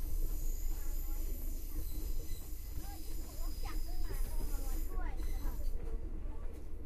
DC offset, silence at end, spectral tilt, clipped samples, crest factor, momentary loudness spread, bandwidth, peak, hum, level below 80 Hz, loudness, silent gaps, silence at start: under 0.1%; 0 s; -5 dB/octave; under 0.1%; 12 dB; 4 LU; 15.5 kHz; -24 dBFS; none; -36 dBFS; -45 LUFS; none; 0 s